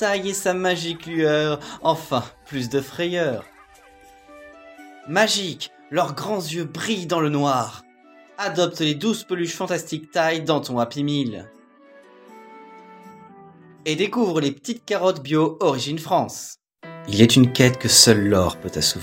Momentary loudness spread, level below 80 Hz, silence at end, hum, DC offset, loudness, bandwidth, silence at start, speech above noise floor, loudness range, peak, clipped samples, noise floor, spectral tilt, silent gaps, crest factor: 15 LU; -56 dBFS; 0 s; none; under 0.1%; -21 LUFS; 16 kHz; 0 s; 29 dB; 10 LU; 0 dBFS; under 0.1%; -50 dBFS; -4 dB/octave; none; 22 dB